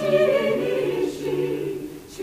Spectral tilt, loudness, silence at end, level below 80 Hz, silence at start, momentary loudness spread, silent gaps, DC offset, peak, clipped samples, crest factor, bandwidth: -6 dB/octave; -23 LUFS; 0 s; -56 dBFS; 0 s; 12 LU; none; under 0.1%; -6 dBFS; under 0.1%; 16 dB; 15.5 kHz